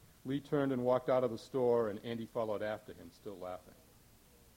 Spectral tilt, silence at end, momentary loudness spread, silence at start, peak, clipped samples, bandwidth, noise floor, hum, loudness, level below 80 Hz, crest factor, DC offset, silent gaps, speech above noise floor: -7 dB/octave; 0.85 s; 17 LU; 0.25 s; -20 dBFS; under 0.1%; 17 kHz; -63 dBFS; none; -36 LUFS; -70 dBFS; 18 dB; under 0.1%; none; 27 dB